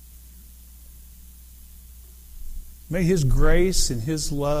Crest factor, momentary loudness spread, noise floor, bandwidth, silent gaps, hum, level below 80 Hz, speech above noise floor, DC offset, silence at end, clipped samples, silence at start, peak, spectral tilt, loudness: 18 dB; 25 LU; -45 dBFS; 16 kHz; none; none; -26 dBFS; 26 dB; under 0.1%; 0 s; under 0.1%; 0.9 s; -6 dBFS; -5 dB/octave; -23 LUFS